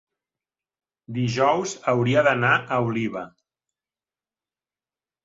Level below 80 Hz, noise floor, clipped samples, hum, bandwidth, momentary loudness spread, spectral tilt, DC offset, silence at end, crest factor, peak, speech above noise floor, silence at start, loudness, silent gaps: -62 dBFS; under -90 dBFS; under 0.1%; none; 8 kHz; 14 LU; -5.5 dB/octave; under 0.1%; 1.95 s; 20 dB; -6 dBFS; over 68 dB; 1.1 s; -22 LUFS; none